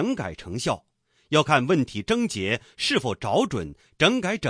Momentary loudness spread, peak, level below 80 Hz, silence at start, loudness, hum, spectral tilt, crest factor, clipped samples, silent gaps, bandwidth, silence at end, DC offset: 11 LU; -4 dBFS; -54 dBFS; 0 s; -24 LUFS; none; -4.5 dB/octave; 20 dB; under 0.1%; none; 10.5 kHz; 0 s; under 0.1%